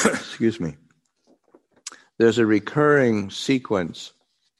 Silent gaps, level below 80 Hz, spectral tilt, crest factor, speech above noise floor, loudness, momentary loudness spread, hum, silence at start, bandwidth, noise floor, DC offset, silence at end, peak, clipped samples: none; -60 dBFS; -5 dB/octave; 20 dB; 43 dB; -21 LUFS; 22 LU; none; 0 s; 12 kHz; -63 dBFS; under 0.1%; 0.5 s; -2 dBFS; under 0.1%